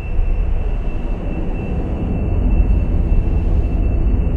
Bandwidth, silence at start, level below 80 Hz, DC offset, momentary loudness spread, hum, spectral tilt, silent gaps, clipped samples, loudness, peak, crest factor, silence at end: 3.2 kHz; 0 s; -16 dBFS; under 0.1%; 6 LU; none; -10 dB/octave; none; under 0.1%; -20 LUFS; -2 dBFS; 14 dB; 0 s